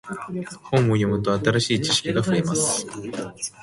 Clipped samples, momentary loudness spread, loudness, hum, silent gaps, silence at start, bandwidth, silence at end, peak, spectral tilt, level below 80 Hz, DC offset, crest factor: under 0.1%; 11 LU; -22 LUFS; none; none; 0.05 s; 11.5 kHz; 0 s; -6 dBFS; -4.5 dB/octave; -52 dBFS; under 0.1%; 18 dB